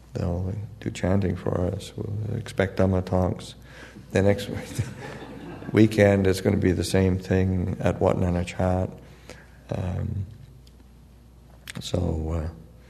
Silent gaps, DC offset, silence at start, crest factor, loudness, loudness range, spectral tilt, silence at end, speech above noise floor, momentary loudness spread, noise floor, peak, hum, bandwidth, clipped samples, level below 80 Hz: none; under 0.1%; 0.1 s; 22 dB; -25 LUFS; 10 LU; -7 dB/octave; 0.25 s; 26 dB; 18 LU; -50 dBFS; -2 dBFS; none; 13.5 kHz; under 0.1%; -44 dBFS